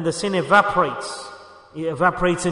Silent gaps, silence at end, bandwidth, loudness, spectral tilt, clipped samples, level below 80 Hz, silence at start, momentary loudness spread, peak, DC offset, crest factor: none; 0 s; 11 kHz; -20 LUFS; -4.5 dB/octave; under 0.1%; -46 dBFS; 0 s; 18 LU; -4 dBFS; under 0.1%; 18 dB